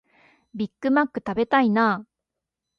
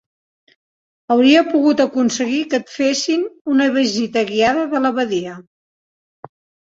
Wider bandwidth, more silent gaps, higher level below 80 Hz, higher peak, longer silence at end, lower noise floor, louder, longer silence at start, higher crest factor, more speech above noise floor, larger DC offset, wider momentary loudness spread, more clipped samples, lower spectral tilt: second, 6.6 kHz vs 7.8 kHz; second, none vs 3.41-3.45 s; about the same, -64 dBFS vs -60 dBFS; second, -6 dBFS vs -2 dBFS; second, 0.75 s vs 1.3 s; second, -85 dBFS vs under -90 dBFS; second, -23 LUFS vs -17 LUFS; second, 0.55 s vs 1.1 s; about the same, 18 dB vs 16 dB; second, 63 dB vs over 74 dB; neither; first, 12 LU vs 8 LU; neither; first, -7.5 dB/octave vs -3.5 dB/octave